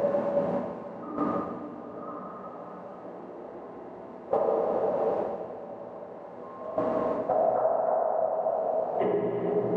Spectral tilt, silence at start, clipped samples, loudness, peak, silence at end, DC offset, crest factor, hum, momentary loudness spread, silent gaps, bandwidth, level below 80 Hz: -9.5 dB/octave; 0 s; under 0.1%; -29 LUFS; -14 dBFS; 0 s; under 0.1%; 16 dB; none; 16 LU; none; 5 kHz; -68 dBFS